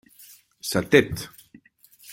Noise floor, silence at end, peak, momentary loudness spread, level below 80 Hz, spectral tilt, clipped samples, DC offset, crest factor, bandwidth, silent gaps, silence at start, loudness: -55 dBFS; 0 s; -2 dBFS; 16 LU; -54 dBFS; -4.5 dB/octave; under 0.1%; under 0.1%; 24 dB; 17 kHz; none; 0.65 s; -23 LUFS